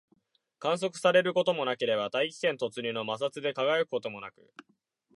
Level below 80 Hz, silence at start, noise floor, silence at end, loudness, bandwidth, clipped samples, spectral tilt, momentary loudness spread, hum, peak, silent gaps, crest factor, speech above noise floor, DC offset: -80 dBFS; 0.6 s; -71 dBFS; 0.85 s; -29 LUFS; 11.5 kHz; under 0.1%; -4 dB/octave; 10 LU; none; -12 dBFS; none; 20 dB; 41 dB; under 0.1%